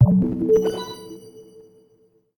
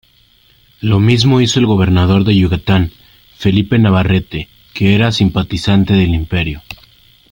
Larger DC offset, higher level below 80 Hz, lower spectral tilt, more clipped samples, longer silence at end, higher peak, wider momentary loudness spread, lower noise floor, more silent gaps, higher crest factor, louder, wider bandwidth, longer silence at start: neither; second, -46 dBFS vs -34 dBFS; first, -8.5 dB/octave vs -6.5 dB/octave; neither; first, 0.95 s vs 0.6 s; second, -4 dBFS vs 0 dBFS; first, 22 LU vs 11 LU; first, -60 dBFS vs -50 dBFS; neither; first, 18 dB vs 12 dB; second, -20 LUFS vs -13 LUFS; first, 19.5 kHz vs 16.5 kHz; second, 0 s vs 0.85 s